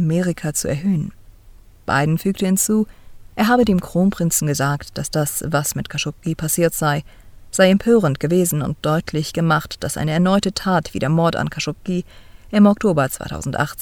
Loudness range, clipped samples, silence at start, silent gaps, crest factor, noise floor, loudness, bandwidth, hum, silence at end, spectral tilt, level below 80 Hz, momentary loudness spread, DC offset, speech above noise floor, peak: 2 LU; under 0.1%; 0 s; none; 16 dB; -44 dBFS; -19 LUFS; 19 kHz; none; 0 s; -5 dB/octave; -42 dBFS; 10 LU; under 0.1%; 26 dB; -2 dBFS